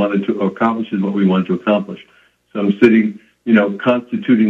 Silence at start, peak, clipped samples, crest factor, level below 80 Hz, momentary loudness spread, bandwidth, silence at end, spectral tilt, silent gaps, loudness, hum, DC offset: 0 s; 0 dBFS; under 0.1%; 16 dB; -60 dBFS; 12 LU; 5.8 kHz; 0 s; -8.5 dB/octave; none; -16 LUFS; none; under 0.1%